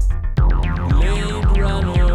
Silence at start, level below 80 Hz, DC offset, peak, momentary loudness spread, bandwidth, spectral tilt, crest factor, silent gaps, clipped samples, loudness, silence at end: 0 s; -16 dBFS; under 0.1%; -6 dBFS; 2 LU; 9.2 kHz; -7 dB/octave; 10 dB; none; under 0.1%; -19 LUFS; 0 s